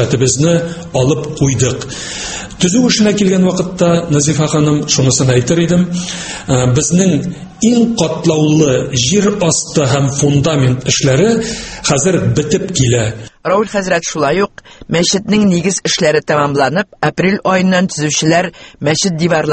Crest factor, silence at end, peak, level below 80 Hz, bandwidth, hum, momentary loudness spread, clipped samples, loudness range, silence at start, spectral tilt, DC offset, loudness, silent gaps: 12 dB; 0 s; 0 dBFS; -38 dBFS; 8.8 kHz; none; 7 LU; under 0.1%; 2 LU; 0 s; -4.5 dB/octave; under 0.1%; -13 LUFS; none